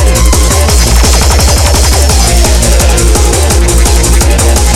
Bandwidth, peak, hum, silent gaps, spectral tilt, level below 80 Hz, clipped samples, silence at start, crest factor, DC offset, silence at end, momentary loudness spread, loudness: 16 kHz; 0 dBFS; none; none; -3.5 dB/octave; -8 dBFS; 0.4%; 0 s; 6 dB; under 0.1%; 0 s; 1 LU; -7 LUFS